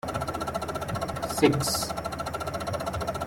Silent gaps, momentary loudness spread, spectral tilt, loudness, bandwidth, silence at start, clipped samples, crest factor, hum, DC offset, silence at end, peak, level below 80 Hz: none; 9 LU; -4.5 dB/octave; -29 LUFS; 17 kHz; 0.05 s; under 0.1%; 22 dB; none; under 0.1%; 0 s; -6 dBFS; -48 dBFS